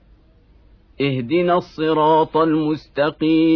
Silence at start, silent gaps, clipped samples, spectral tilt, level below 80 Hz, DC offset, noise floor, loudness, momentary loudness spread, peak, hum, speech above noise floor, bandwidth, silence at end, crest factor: 1 s; none; under 0.1%; -8.5 dB/octave; -52 dBFS; under 0.1%; -51 dBFS; -18 LUFS; 7 LU; -4 dBFS; none; 34 dB; 5.4 kHz; 0 s; 14 dB